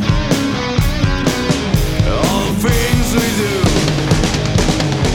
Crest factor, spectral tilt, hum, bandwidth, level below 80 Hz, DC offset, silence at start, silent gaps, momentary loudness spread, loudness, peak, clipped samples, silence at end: 12 dB; -5 dB/octave; none; 18.5 kHz; -22 dBFS; under 0.1%; 0 s; none; 2 LU; -15 LUFS; -2 dBFS; under 0.1%; 0 s